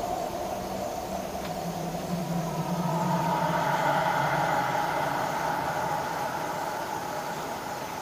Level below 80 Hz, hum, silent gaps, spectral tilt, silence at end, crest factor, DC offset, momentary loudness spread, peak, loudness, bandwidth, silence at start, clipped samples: -54 dBFS; none; none; -5 dB/octave; 0 s; 16 dB; under 0.1%; 8 LU; -14 dBFS; -29 LUFS; 16 kHz; 0 s; under 0.1%